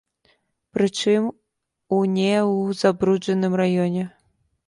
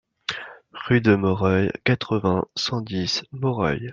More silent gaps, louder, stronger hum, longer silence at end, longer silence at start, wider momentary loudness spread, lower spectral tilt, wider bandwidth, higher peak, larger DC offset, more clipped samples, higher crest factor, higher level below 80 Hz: neither; about the same, -21 LUFS vs -23 LUFS; neither; first, 0.6 s vs 0 s; first, 0.75 s vs 0.3 s; second, 8 LU vs 12 LU; about the same, -6 dB/octave vs -6 dB/octave; first, 11.5 kHz vs 7.4 kHz; about the same, -4 dBFS vs -4 dBFS; neither; neither; about the same, 18 dB vs 20 dB; second, -62 dBFS vs -54 dBFS